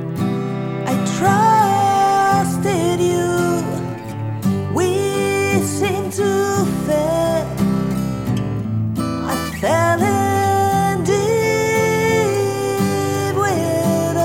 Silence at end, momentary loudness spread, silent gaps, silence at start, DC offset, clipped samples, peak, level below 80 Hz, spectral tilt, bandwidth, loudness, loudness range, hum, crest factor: 0 s; 7 LU; none; 0 s; under 0.1%; under 0.1%; -2 dBFS; -44 dBFS; -5.5 dB/octave; 18 kHz; -18 LUFS; 3 LU; none; 14 dB